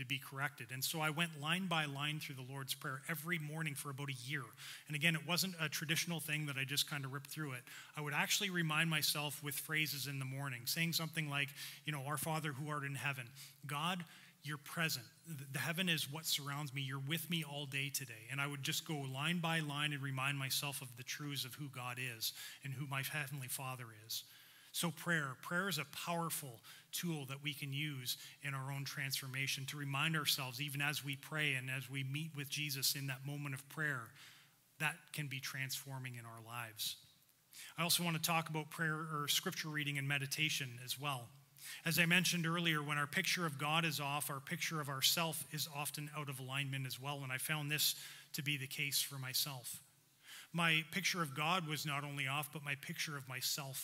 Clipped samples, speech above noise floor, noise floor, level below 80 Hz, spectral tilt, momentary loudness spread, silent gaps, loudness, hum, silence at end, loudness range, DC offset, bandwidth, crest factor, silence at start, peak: under 0.1%; 28 dB; -69 dBFS; under -90 dBFS; -3 dB/octave; 11 LU; none; -39 LUFS; none; 0 s; 6 LU; under 0.1%; 16 kHz; 24 dB; 0 s; -18 dBFS